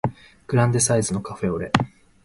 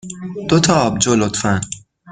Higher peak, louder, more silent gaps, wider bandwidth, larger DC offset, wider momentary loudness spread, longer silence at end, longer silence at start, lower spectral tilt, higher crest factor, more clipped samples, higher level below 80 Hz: about the same, 0 dBFS vs 0 dBFS; second, -22 LUFS vs -16 LUFS; neither; first, 11.5 kHz vs 9.6 kHz; neither; second, 9 LU vs 15 LU; first, 0.35 s vs 0 s; about the same, 0.05 s vs 0.05 s; about the same, -5 dB/octave vs -4.5 dB/octave; first, 22 dB vs 16 dB; neither; about the same, -48 dBFS vs -46 dBFS